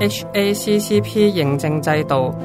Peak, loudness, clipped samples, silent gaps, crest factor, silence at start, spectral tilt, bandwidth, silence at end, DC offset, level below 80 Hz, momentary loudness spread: -2 dBFS; -18 LUFS; under 0.1%; none; 14 dB; 0 s; -5.5 dB/octave; 16 kHz; 0 s; under 0.1%; -50 dBFS; 3 LU